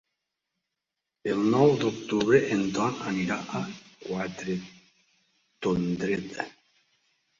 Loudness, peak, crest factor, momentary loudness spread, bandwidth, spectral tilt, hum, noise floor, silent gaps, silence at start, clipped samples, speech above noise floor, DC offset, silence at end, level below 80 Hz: -27 LUFS; -8 dBFS; 22 dB; 15 LU; 7.6 kHz; -6 dB/octave; none; -86 dBFS; none; 1.25 s; under 0.1%; 59 dB; under 0.1%; 0.9 s; -62 dBFS